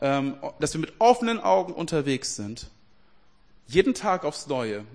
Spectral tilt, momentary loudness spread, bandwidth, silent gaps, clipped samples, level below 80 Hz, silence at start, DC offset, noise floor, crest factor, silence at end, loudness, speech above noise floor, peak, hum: -4.5 dB/octave; 11 LU; 10.5 kHz; none; under 0.1%; -54 dBFS; 0 s; 0.2%; -62 dBFS; 20 dB; 0 s; -25 LUFS; 37 dB; -6 dBFS; none